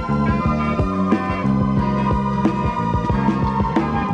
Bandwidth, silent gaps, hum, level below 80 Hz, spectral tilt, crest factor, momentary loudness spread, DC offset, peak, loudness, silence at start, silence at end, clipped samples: 8.6 kHz; none; none; -30 dBFS; -8.5 dB/octave; 14 dB; 1 LU; under 0.1%; -6 dBFS; -19 LUFS; 0 s; 0 s; under 0.1%